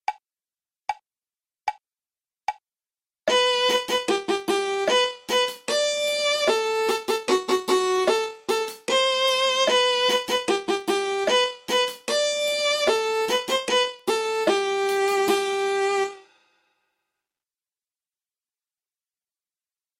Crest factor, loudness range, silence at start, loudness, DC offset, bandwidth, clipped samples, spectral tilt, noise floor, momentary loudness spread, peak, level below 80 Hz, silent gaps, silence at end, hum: 18 dB; 6 LU; 0.1 s; -22 LUFS; under 0.1%; 16 kHz; under 0.1%; -1 dB/octave; under -90 dBFS; 11 LU; -8 dBFS; -66 dBFS; none; 3.8 s; none